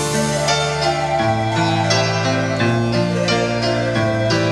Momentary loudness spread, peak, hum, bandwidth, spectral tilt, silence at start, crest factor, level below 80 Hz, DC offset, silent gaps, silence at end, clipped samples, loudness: 2 LU; -4 dBFS; none; 13 kHz; -4.5 dB/octave; 0 s; 14 dB; -42 dBFS; under 0.1%; none; 0 s; under 0.1%; -17 LUFS